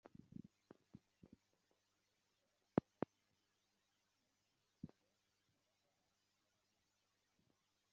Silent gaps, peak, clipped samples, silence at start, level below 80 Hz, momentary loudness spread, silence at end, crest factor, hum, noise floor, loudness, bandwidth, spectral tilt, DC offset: none; -20 dBFS; under 0.1%; 2.75 s; -86 dBFS; 22 LU; 3.05 s; 36 dB; none; -86 dBFS; -48 LUFS; 7.2 kHz; -8 dB/octave; under 0.1%